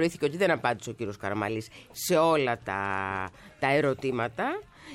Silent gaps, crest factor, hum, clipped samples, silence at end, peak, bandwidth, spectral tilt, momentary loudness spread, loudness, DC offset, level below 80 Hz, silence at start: none; 18 dB; none; under 0.1%; 0 s; -12 dBFS; 16.5 kHz; -5 dB/octave; 11 LU; -28 LUFS; under 0.1%; -62 dBFS; 0 s